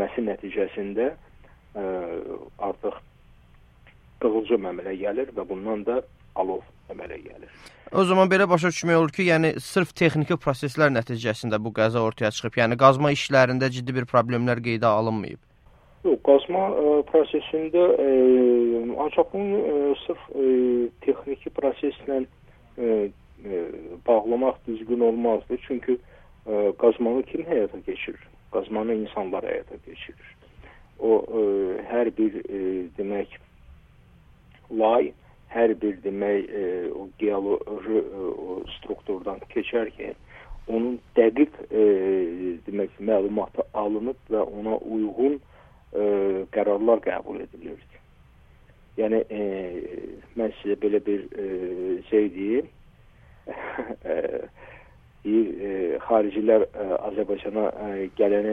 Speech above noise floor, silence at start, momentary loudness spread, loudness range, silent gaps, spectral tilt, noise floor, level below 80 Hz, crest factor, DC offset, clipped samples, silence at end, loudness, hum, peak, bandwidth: 30 dB; 0 s; 14 LU; 8 LU; none; -6.5 dB/octave; -54 dBFS; -54 dBFS; 24 dB; under 0.1%; under 0.1%; 0 s; -24 LUFS; none; -2 dBFS; 12 kHz